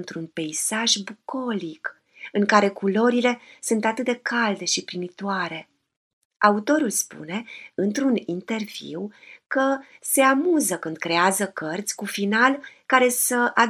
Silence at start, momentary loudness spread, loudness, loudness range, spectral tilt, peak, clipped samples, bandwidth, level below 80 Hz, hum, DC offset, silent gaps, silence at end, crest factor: 0 s; 14 LU; -23 LUFS; 4 LU; -3 dB/octave; -2 dBFS; under 0.1%; 15.5 kHz; -78 dBFS; none; under 0.1%; 5.97-6.31 s; 0 s; 22 dB